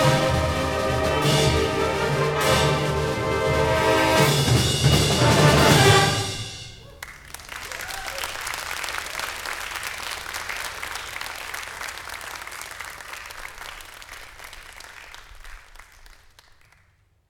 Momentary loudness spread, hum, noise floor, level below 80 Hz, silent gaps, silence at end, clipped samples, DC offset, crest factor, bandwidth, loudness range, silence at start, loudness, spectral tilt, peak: 22 LU; none; -61 dBFS; -38 dBFS; none; 1.45 s; under 0.1%; under 0.1%; 20 dB; 18.5 kHz; 20 LU; 0 s; -21 LUFS; -4 dB/octave; -4 dBFS